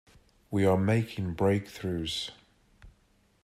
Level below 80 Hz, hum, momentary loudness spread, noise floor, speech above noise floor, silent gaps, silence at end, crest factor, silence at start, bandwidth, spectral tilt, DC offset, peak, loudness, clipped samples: -58 dBFS; none; 9 LU; -67 dBFS; 39 dB; none; 0.55 s; 18 dB; 0.5 s; 14.5 kHz; -6.5 dB/octave; under 0.1%; -12 dBFS; -29 LUFS; under 0.1%